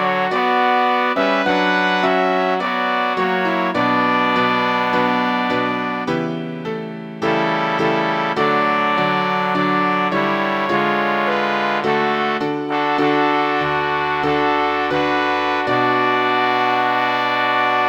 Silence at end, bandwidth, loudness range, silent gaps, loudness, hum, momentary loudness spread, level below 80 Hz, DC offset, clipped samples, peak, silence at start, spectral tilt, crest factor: 0 s; 19.5 kHz; 2 LU; none; -18 LUFS; none; 4 LU; -56 dBFS; under 0.1%; under 0.1%; -2 dBFS; 0 s; -5.5 dB/octave; 16 dB